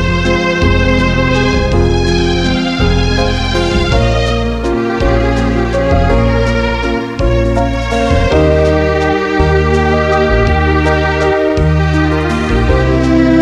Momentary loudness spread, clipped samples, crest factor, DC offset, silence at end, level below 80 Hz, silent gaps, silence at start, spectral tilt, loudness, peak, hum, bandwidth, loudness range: 3 LU; under 0.1%; 10 dB; under 0.1%; 0 s; -18 dBFS; none; 0 s; -6.5 dB/octave; -12 LUFS; 0 dBFS; none; 10.5 kHz; 2 LU